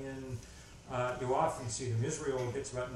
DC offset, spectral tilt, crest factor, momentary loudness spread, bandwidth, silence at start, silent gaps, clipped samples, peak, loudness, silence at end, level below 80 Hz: under 0.1%; -5 dB/octave; 18 dB; 13 LU; 12.5 kHz; 0 s; none; under 0.1%; -18 dBFS; -36 LUFS; 0 s; -58 dBFS